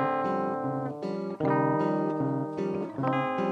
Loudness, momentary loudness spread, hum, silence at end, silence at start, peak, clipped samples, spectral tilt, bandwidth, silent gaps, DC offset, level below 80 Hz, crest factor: -29 LUFS; 7 LU; none; 0 s; 0 s; -14 dBFS; under 0.1%; -9 dB/octave; 8.8 kHz; none; under 0.1%; -72 dBFS; 14 dB